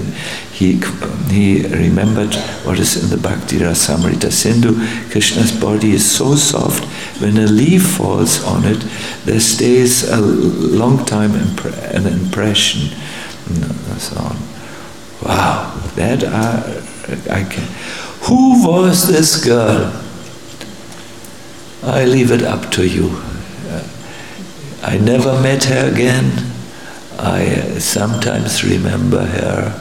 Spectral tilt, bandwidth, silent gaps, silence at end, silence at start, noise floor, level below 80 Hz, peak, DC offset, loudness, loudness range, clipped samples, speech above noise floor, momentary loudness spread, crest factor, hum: -4.5 dB/octave; 19 kHz; none; 0 s; 0 s; -34 dBFS; -38 dBFS; 0 dBFS; 2%; -14 LUFS; 6 LU; under 0.1%; 21 dB; 18 LU; 14 dB; none